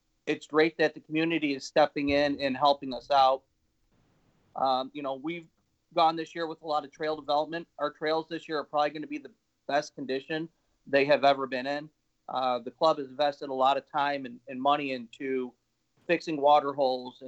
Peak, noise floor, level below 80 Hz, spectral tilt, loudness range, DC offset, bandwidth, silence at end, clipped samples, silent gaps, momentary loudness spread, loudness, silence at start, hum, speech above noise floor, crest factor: -10 dBFS; -71 dBFS; -66 dBFS; -5 dB/octave; 5 LU; under 0.1%; 8.2 kHz; 0 s; under 0.1%; none; 12 LU; -29 LUFS; 0.25 s; none; 43 dB; 18 dB